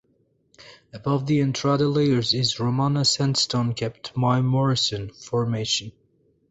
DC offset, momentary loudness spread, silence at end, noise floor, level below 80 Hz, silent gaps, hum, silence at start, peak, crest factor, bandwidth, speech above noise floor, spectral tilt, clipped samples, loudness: under 0.1%; 9 LU; 0.6 s; -66 dBFS; -56 dBFS; none; none; 0.65 s; -8 dBFS; 16 dB; 8.4 kHz; 43 dB; -5 dB/octave; under 0.1%; -23 LUFS